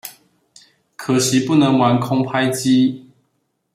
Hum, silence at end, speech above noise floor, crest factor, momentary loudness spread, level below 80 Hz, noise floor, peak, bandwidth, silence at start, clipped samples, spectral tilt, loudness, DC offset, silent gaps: none; 0.75 s; 53 dB; 16 dB; 13 LU; -60 dBFS; -69 dBFS; -2 dBFS; 15.5 kHz; 0.05 s; under 0.1%; -5 dB/octave; -16 LUFS; under 0.1%; none